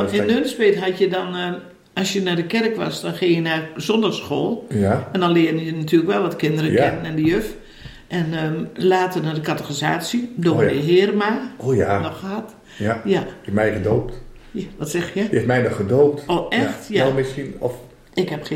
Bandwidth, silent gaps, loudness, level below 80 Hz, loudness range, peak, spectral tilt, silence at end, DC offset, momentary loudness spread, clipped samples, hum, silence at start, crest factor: 16.5 kHz; none; -20 LUFS; -48 dBFS; 3 LU; -4 dBFS; -6 dB/octave; 0 s; under 0.1%; 10 LU; under 0.1%; none; 0 s; 16 dB